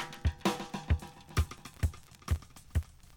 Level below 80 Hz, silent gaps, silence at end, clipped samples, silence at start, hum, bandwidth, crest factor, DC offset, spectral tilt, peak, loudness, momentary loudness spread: -38 dBFS; none; 0.3 s; under 0.1%; 0 s; none; 18 kHz; 20 dB; under 0.1%; -5.5 dB/octave; -14 dBFS; -36 LUFS; 5 LU